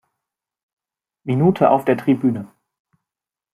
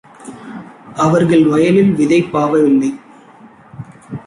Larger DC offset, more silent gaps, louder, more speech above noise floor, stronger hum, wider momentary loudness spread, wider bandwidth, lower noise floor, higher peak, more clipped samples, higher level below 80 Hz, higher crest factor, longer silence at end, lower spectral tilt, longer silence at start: neither; neither; second, -17 LUFS vs -13 LUFS; first, 70 dB vs 30 dB; neither; second, 12 LU vs 23 LU; first, 13.5 kHz vs 11.5 kHz; first, -87 dBFS vs -42 dBFS; about the same, -2 dBFS vs -2 dBFS; neither; second, -62 dBFS vs -52 dBFS; first, 20 dB vs 12 dB; first, 1.1 s vs 0.05 s; first, -9 dB/octave vs -7 dB/octave; first, 1.25 s vs 0.2 s